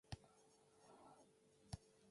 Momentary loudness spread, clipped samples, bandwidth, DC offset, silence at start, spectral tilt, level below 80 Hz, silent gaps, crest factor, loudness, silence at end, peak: 9 LU; under 0.1%; 11.5 kHz; under 0.1%; 0.05 s; -5 dB/octave; -70 dBFS; none; 28 dB; -61 LUFS; 0 s; -34 dBFS